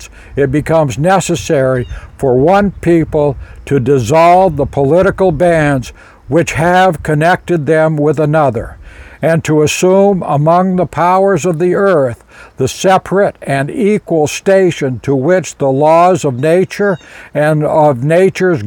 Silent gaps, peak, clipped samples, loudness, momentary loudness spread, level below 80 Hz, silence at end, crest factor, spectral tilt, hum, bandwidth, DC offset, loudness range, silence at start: none; 0 dBFS; under 0.1%; -11 LUFS; 7 LU; -36 dBFS; 0 s; 10 dB; -6 dB/octave; none; 19 kHz; under 0.1%; 2 LU; 0 s